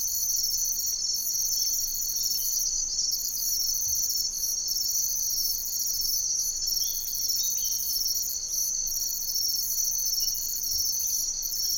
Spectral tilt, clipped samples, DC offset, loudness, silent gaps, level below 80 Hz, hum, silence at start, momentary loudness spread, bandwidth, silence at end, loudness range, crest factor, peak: 2.5 dB/octave; under 0.1%; under 0.1%; -25 LUFS; none; -50 dBFS; none; 0 s; 2 LU; 17.5 kHz; 0 s; 1 LU; 16 dB; -12 dBFS